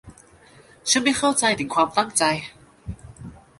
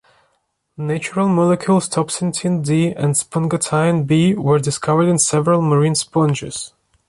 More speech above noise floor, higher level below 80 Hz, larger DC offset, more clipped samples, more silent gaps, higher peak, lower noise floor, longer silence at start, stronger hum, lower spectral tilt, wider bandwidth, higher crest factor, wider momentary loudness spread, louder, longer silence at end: second, 30 dB vs 50 dB; about the same, -50 dBFS vs -54 dBFS; neither; neither; neither; about the same, -4 dBFS vs -2 dBFS; second, -51 dBFS vs -67 dBFS; second, 0.05 s vs 0.8 s; neither; second, -2.5 dB/octave vs -5.5 dB/octave; about the same, 12 kHz vs 11.5 kHz; first, 20 dB vs 14 dB; first, 22 LU vs 8 LU; second, -21 LUFS vs -17 LUFS; second, 0.25 s vs 0.4 s